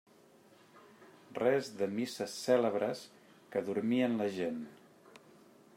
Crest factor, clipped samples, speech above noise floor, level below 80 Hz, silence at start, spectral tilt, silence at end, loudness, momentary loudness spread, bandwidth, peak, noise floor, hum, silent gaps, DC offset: 20 dB; under 0.1%; 29 dB; -84 dBFS; 0.75 s; -5.5 dB/octave; 1 s; -34 LUFS; 15 LU; 16 kHz; -16 dBFS; -62 dBFS; none; none; under 0.1%